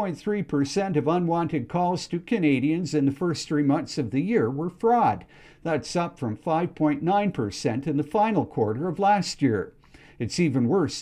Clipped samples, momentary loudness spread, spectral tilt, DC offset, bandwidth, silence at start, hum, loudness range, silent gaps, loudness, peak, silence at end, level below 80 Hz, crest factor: under 0.1%; 7 LU; -6.5 dB/octave; under 0.1%; 11.5 kHz; 0 s; none; 1 LU; none; -25 LUFS; -10 dBFS; 0 s; -58 dBFS; 14 dB